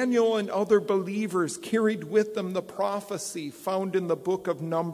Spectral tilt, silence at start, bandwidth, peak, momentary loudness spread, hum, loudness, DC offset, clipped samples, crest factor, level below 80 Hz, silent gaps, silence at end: -5.5 dB/octave; 0 s; 16 kHz; -10 dBFS; 8 LU; none; -27 LUFS; under 0.1%; under 0.1%; 16 dB; -74 dBFS; none; 0 s